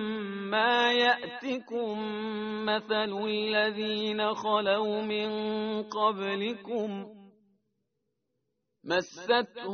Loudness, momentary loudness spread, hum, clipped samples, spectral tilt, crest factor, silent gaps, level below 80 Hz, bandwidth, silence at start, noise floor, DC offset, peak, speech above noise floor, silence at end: -29 LUFS; 9 LU; none; under 0.1%; -1.5 dB/octave; 20 dB; none; -74 dBFS; 6.6 kHz; 0 s; -82 dBFS; under 0.1%; -10 dBFS; 52 dB; 0 s